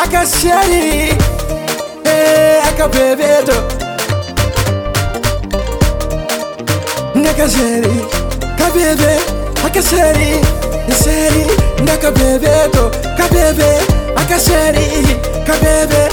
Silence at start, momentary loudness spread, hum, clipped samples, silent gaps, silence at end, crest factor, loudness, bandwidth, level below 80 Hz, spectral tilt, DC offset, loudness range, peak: 0 s; 8 LU; none; under 0.1%; none; 0 s; 12 dB; -12 LUFS; over 20 kHz; -20 dBFS; -4.5 dB/octave; under 0.1%; 4 LU; 0 dBFS